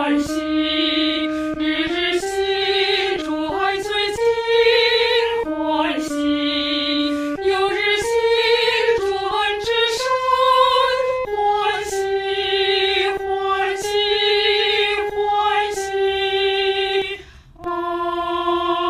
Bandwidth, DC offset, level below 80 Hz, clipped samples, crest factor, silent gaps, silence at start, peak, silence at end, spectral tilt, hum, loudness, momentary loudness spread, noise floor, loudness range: 15.5 kHz; under 0.1%; -48 dBFS; under 0.1%; 16 dB; none; 0 s; -4 dBFS; 0 s; -2.5 dB/octave; none; -19 LUFS; 6 LU; -40 dBFS; 2 LU